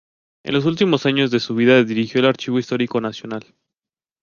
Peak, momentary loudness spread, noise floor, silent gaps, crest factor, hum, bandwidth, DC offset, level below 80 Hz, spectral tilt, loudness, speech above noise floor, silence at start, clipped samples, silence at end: -2 dBFS; 15 LU; under -90 dBFS; none; 18 dB; none; 7.2 kHz; under 0.1%; -60 dBFS; -6 dB/octave; -18 LUFS; over 72 dB; 0.45 s; under 0.1%; 0.85 s